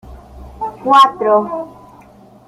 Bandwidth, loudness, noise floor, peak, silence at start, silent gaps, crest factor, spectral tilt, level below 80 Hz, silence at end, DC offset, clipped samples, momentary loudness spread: 15 kHz; -12 LUFS; -43 dBFS; 0 dBFS; 0.1 s; none; 16 dB; -4.5 dB/octave; -42 dBFS; 0.8 s; under 0.1%; under 0.1%; 17 LU